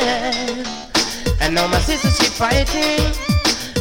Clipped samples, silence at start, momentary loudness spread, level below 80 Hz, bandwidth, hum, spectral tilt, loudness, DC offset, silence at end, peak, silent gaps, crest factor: under 0.1%; 0 s; 5 LU; -26 dBFS; 17 kHz; none; -3.5 dB/octave; -17 LUFS; under 0.1%; 0 s; -2 dBFS; none; 16 dB